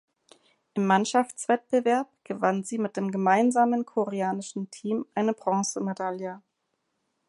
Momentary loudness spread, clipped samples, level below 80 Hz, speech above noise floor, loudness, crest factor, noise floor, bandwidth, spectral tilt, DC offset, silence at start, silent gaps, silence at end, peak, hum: 12 LU; under 0.1%; -80 dBFS; 52 dB; -27 LUFS; 20 dB; -78 dBFS; 11.5 kHz; -5 dB/octave; under 0.1%; 0.75 s; none; 0.9 s; -8 dBFS; none